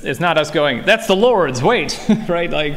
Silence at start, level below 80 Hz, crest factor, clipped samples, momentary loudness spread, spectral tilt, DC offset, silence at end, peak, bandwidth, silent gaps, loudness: 0 s; -38 dBFS; 14 dB; under 0.1%; 5 LU; -4.5 dB/octave; under 0.1%; 0 s; -2 dBFS; 16 kHz; none; -15 LUFS